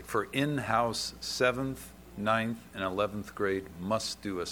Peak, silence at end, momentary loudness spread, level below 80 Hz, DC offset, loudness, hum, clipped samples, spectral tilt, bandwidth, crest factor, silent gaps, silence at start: -10 dBFS; 0 s; 7 LU; -56 dBFS; under 0.1%; -32 LUFS; none; under 0.1%; -4.5 dB/octave; 19.5 kHz; 22 dB; none; 0 s